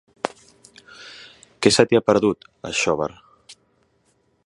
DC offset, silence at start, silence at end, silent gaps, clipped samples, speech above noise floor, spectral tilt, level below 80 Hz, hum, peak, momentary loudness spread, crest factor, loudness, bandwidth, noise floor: under 0.1%; 0.25 s; 0.95 s; none; under 0.1%; 46 dB; -4 dB/octave; -56 dBFS; none; 0 dBFS; 24 LU; 24 dB; -20 LUFS; 11.5 kHz; -65 dBFS